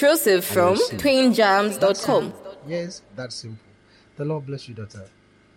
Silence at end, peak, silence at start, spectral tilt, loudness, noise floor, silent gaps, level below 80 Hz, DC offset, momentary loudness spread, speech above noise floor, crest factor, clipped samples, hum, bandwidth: 0.5 s; -6 dBFS; 0 s; -4 dB/octave; -20 LUFS; -54 dBFS; none; -58 dBFS; under 0.1%; 20 LU; 33 dB; 16 dB; under 0.1%; none; 17 kHz